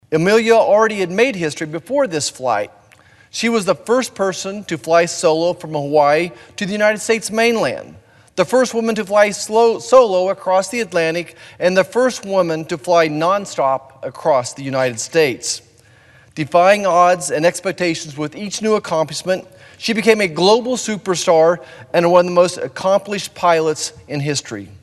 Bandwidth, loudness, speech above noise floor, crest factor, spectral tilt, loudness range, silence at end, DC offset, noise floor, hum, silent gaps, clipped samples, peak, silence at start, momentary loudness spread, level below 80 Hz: 12.5 kHz; -16 LUFS; 32 dB; 16 dB; -4 dB/octave; 3 LU; 0.05 s; under 0.1%; -49 dBFS; none; none; under 0.1%; 0 dBFS; 0.1 s; 11 LU; -60 dBFS